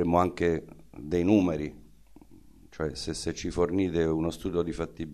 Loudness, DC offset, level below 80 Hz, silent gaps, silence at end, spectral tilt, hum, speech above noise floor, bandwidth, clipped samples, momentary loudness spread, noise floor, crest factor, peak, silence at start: -29 LUFS; 0.2%; -48 dBFS; none; 0 s; -6.5 dB/octave; none; 27 dB; 13.5 kHz; under 0.1%; 11 LU; -54 dBFS; 20 dB; -8 dBFS; 0 s